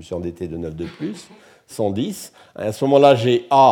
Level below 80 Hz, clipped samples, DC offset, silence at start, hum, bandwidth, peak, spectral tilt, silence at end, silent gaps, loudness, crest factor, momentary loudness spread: -52 dBFS; under 0.1%; under 0.1%; 0 s; none; 17 kHz; -2 dBFS; -6 dB/octave; 0 s; none; -19 LUFS; 18 dB; 20 LU